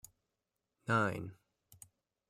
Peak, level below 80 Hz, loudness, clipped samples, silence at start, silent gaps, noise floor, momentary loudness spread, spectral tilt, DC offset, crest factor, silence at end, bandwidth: -20 dBFS; -74 dBFS; -36 LUFS; under 0.1%; 0.85 s; none; -88 dBFS; 25 LU; -6 dB/octave; under 0.1%; 22 dB; 0.95 s; 16 kHz